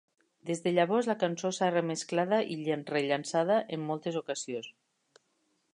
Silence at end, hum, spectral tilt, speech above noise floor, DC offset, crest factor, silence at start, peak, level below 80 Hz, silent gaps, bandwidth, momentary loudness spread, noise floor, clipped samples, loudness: 1.05 s; none; -5 dB/octave; 45 dB; under 0.1%; 18 dB; 0.45 s; -12 dBFS; -82 dBFS; none; 11 kHz; 9 LU; -75 dBFS; under 0.1%; -31 LUFS